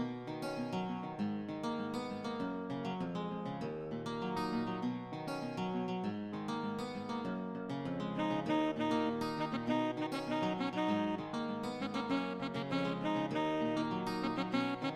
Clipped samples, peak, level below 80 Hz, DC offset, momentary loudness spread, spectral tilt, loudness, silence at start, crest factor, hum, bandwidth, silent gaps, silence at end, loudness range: under 0.1%; -22 dBFS; -70 dBFS; under 0.1%; 6 LU; -6.5 dB/octave; -38 LUFS; 0 s; 14 dB; none; 13.5 kHz; none; 0 s; 4 LU